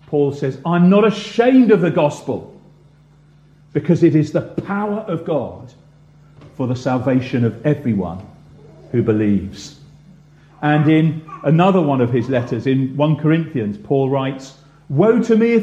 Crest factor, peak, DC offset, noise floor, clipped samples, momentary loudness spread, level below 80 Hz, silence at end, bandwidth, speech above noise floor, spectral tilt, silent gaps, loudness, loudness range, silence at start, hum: 16 dB; -2 dBFS; under 0.1%; -49 dBFS; under 0.1%; 12 LU; -52 dBFS; 0 s; 8.6 kHz; 33 dB; -8 dB/octave; none; -17 LUFS; 5 LU; 0.1 s; none